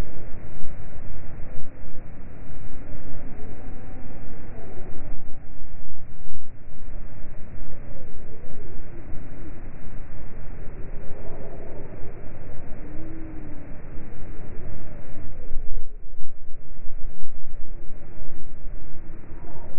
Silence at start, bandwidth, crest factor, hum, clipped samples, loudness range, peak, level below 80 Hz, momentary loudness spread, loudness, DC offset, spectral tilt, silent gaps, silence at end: 0 s; 2.5 kHz; 10 dB; none; under 0.1%; 3 LU; -4 dBFS; -32 dBFS; 6 LU; -42 LUFS; under 0.1%; -7.5 dB/octave; none; 0 s